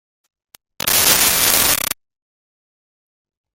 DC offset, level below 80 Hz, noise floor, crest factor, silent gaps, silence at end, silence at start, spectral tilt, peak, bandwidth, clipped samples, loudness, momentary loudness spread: under 0.1%; -46 dBFS; under -90 dBFS; 20 dB; none; 1.6 s; 0.85 s; 0 dB/octave; 0 dBFS; over 20 kHz; under 0.1%; -13 LUFS; 12 LU